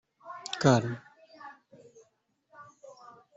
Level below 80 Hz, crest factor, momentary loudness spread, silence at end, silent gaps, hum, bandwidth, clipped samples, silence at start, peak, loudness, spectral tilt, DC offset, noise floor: -70 dBFS; 24 dB; 27 LU; 0.45 s; none; none; 8.2 kHz; under 0.1%; 0.25 s; -10 dBFS; -27 LUFS; -5.5 dB/octave; under 0.1%; -73 dBFS